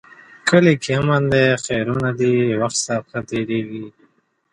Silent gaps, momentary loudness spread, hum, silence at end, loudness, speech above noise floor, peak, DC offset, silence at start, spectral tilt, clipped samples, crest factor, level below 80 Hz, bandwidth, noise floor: none; 11 LU; none; 0.65 s; -18 LUFS; 42 dB; -2 dBFS; under 0.1%; 0.45 s; -5 dB/octave; under 0.1%; 18 dB; -52 dBFS; 11.5 kHz; -60 dBFS